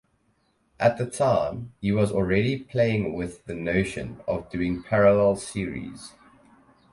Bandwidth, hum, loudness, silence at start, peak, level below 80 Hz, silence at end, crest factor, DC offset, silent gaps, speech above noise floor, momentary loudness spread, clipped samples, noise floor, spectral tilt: 11.5 kHz; none; -25 LUFS; 0.8 s; -6 dBFS; -48 dBFS; 0.85 s; 18 dB; under 0.1%; none; 44 dB; 13 LU; under 0.1%; -68 dBFS; -6.5 dB/octave